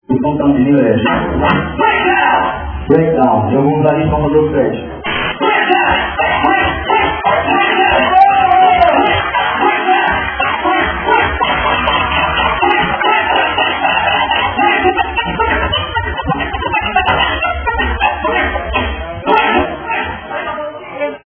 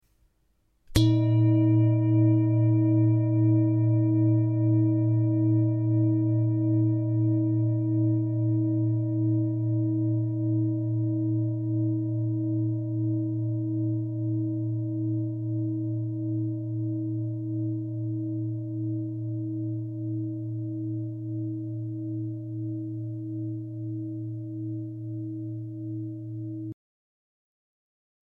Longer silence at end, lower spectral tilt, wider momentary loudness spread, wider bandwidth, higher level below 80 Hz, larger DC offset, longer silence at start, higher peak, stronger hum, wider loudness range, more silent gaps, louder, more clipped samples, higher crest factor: second, 0.1 s vs 1.55 s; about the same, -8.5 dB/octave vs -9.5 dB/octave; second, 7 LU vs 12 LU; second, 5.4 kHz vs 6.6 kHz; first, -30 dBFS vs -54 dBFS; neither; second, 0.1 s vs 0.9 s; first, 0 dBFS vs -8 dBFS; neither; second, 4 LU vs 12 LU; neither; first, -12 LUFS vs -27 LUFS; neither; second, 12 dB vs 18 dB